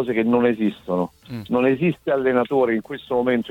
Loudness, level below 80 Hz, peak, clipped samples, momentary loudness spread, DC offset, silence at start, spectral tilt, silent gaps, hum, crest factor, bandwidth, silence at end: -21 LUFS; -56 dBFS; -4 dBFS; under 0.1%; 7 LU; under 0.1%; 0 s; -8.5 dB/octave; none; none; 16 dB; 7.8 kHz; 0 s